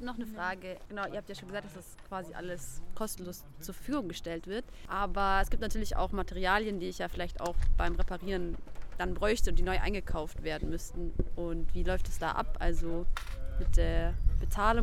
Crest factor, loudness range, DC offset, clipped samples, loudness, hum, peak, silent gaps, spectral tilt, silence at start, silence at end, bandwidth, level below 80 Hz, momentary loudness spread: 18 dB; 7 LU; under 0.1%; under 0.1%; -35 LUFS; none; -12 dBFS; none; -5 dB/octave; 0 s; 0 s; 14 kHz; -34 dBFS; 12 LU